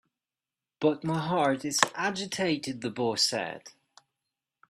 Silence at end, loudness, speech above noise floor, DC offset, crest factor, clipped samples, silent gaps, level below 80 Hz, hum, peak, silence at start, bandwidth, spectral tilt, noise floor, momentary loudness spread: 1 s; -28 LUFS; over 61 dB; under 0.1%; 30 dB; under 0.1%; none; -72 dBFS; none; 0 dBFS; 0.8 s; 15 kHz; -3.5 dB/octave; under -90 dBFS; 8 LU